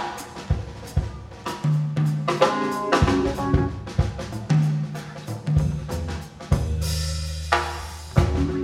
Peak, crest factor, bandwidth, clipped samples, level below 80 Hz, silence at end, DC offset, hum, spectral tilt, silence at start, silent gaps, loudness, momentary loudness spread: 0 dBFS; 24 dB; 15 kHz; under 0.1%; -32 dBFS; 0 s; under 0.1%; none; -6 dB/octave; 0 s; none; -24 LUFS; 12 LU